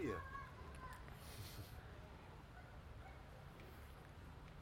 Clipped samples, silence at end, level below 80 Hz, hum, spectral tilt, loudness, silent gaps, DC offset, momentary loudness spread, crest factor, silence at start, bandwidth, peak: under 0.1%; 0 s; -62 dBFS; none; -5.5 dB/octave; -56 LUFS; none; under 0.1%; 6 LU; 20 dB; 0 s; 16.5 kHz; -34 dBFS